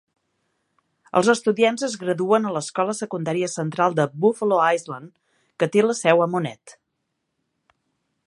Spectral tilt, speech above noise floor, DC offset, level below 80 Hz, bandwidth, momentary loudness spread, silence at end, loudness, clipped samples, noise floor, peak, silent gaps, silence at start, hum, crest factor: -5 dB/octave; 56 dB; under 0.1%; -72 dBFS; 11.5 kHz; 8 LU; 1.55 s; -21 LUFS; under 0.1%; -77 dBFS; -2 dBFS; none; 1.15 s; none; 22 dB